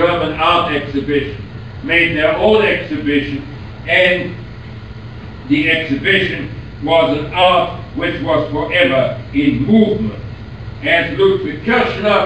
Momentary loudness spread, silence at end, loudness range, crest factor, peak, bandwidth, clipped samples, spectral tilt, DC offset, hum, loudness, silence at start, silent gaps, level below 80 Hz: 18 LU; 0 s; 2 LU; 16 dB; 0 dBFS; 9 kHz; under 0.1%; -7 dB/octave; 0.6%; none; -14 LUFS; 0 s; none; -38 dBFS